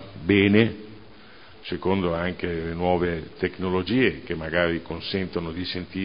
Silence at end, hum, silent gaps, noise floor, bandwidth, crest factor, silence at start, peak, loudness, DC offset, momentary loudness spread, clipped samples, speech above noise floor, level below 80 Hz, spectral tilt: 0 s; none; none; -48 dBFS; 5.4 kHz; 22 dB; 0 s; -2 dBFS; -25 LUFS; 0.4%; 10 LU; under 0.1%; 24 dB; -44 dBFS; -11 dB/octave